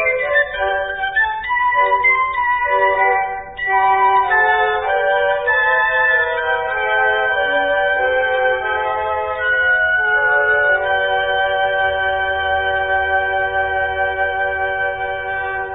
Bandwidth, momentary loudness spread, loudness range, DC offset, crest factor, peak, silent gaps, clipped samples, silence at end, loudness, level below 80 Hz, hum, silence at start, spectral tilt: 4 kHz; 6 LU; 3 LU; under 0.1%; 12 dB; -4 dBFS; none; under 0.1%; 0 s; -16 LUFS; -44 dBFS; none; 0 s; -8 dB/octave